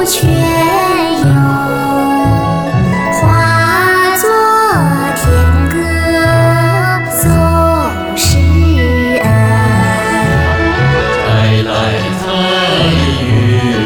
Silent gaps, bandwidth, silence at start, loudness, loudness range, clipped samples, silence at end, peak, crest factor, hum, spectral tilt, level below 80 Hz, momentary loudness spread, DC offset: none; over 20 kHz; 0 s; -10 LUFS; 1 LU; under 0.1%; 0 s; -2 dBFS; 8 dB; none; -5.5 dB/octave; -22 dBFS; 4 LU; under 0.1%